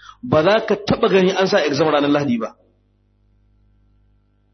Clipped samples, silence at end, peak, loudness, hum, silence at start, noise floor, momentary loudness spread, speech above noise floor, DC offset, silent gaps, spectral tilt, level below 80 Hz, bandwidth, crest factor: under 0.1%; 2.05 s; -2 dBFS; -17 LUFS; 50 Hz at -50 dBFS; 0.25 s; -60 dBFS; 6 LU; 43 dB; under 0.1%; none; -6 dB/octave; -52 dBFS; 6.4 kHz; 16 dB